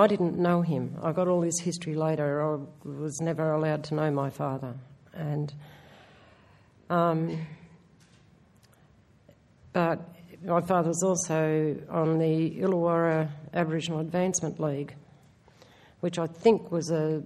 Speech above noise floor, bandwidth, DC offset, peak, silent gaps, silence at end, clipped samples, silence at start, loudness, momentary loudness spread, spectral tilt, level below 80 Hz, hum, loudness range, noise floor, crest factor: 32 dB; 13.5 kHz; under 0.1%; -6 dBFS; none; 0 s; under 0.1%; 0 s; -28 LUFS; 12 LU; -6 dB/octave; -66 dBFS; none; 7 LU; -60 dBFS; 22 dB